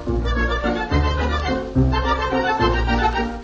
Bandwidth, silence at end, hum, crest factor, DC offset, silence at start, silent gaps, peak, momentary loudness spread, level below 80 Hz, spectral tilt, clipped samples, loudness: 7.4 kHz; 0 s; none; 14 dB; under 0.1%; 0 s; none; -6 dBFS; 3 LU; -24 dBFS; -6.5 dB/octave; under 0.1%; -20 LUFS